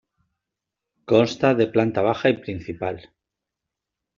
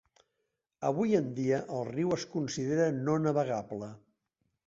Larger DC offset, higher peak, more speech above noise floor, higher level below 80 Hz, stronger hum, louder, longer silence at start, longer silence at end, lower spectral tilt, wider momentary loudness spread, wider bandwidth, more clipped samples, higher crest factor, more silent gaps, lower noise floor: neither; first, -4 dBFS vs -14 dBFS; first, 64 dB vs 53 dB; first, -60 dBFS vs -70 dBFS; neither; first, -21 LUFS vs -32 LUFS; first, 1.1 s vs 0.8 s; first, 1.15 s vs 0.7 s; second, -5 dB/octave vs -6.5 dB/octave; first, 11 LU vs 7 LU; about the same, 7.4 kHz vs 8 kHz; neither; about the same, 20 dB vs 18 dB; neither; about the same, -85 dBFS vs -83 dBFS